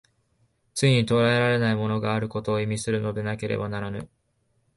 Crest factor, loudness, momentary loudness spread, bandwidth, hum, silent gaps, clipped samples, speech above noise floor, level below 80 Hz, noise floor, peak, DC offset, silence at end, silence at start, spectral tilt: 18 dB; -25 LUFS; 11 LU; 11.5 kHz; none; none; under 0.1%; 46 dB; -56 dBFS; -70 dBFS; -8 dBFS; under 0.1%; 0.7 s; 0.75 s; -6 dB/octave